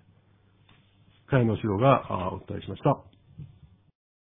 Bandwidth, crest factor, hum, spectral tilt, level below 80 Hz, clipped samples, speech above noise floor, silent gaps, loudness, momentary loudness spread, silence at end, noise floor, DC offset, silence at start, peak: 3.8 kHz; 24 dB; none; -11.5 dB/octave; -56 dBFS; under 0.1%; 36 dB; none; -26 LUFS; 25 LU; 0.9 s; -62 dBFS; under 0.1%; 1.3 s; -6 dBFS